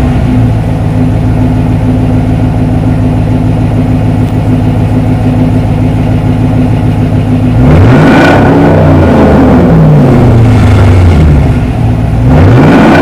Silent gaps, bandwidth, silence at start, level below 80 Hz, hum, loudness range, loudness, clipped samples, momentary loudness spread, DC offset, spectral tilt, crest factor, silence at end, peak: none; 11 kHz; 0 s; -14 dBFS; none; 5 LU; -6 LUFS; 7%; 6 LU; 2%; -8.5 dB/octave; 4 dB; 0 s; 0 dBFS